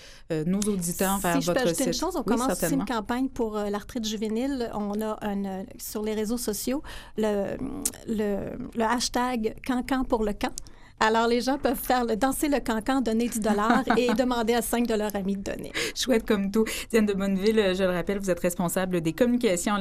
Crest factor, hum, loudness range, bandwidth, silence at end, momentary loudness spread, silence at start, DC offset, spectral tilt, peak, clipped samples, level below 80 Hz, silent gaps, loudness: 22 dB; none; 5 LU; 15.5 kHz; 0 s; 7 LU; 0 s; under 0.1%; -4.5 dB/octave; -4 dBFS; under 0.1%; -44 dBFS; none; -26 LUFS